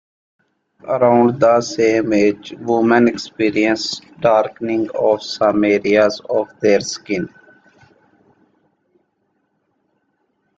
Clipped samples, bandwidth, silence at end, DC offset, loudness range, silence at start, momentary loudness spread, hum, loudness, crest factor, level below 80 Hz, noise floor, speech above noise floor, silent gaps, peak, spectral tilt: under 0.1%; 7.8 kHz; 3.3 s; under 0.1%; 8 LU; 0.85 s; 10 LU; none; -16 LUFS; 16 dB; -58 dBFS; -67 dBFS; 51 dB; none; -2 dBFS; -5 dB/octave